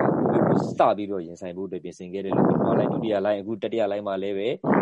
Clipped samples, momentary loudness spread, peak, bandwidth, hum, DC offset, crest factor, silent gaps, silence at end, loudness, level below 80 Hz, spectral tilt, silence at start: under 0.1%; 13 LU; -6 dBFS; 9 kHz; none; under 0.1%; 18 dB; none; 0 s; -24 LUFS; -62 dBFS; -8 dB/octave; 0 s